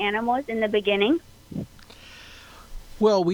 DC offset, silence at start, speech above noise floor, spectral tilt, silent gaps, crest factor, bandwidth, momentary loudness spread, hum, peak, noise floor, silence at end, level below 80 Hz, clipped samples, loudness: under 0.1%; 0 s; 25 dB; -5.5 dB/octave; none; 18 dB; 19 kHz; 23 LU; none; -6 dBFS; -47 dBFS; 0 s; -48 dBFS; under 0.1%; -23 LUFS